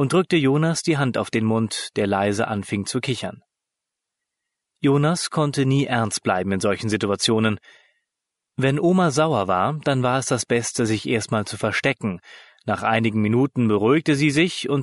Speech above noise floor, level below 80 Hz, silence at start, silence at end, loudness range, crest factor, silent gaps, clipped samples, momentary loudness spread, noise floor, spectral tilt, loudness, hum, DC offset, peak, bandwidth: 63 dB; -60 dBFS; 0 s; 0 s; 4 LU; 16 dB; none; under 0.1%; 7 LU; -84 dBFS; -5 dB/octave; -21 LUFS; none; under 0.1%; -6 dBFS; 11.5 kHz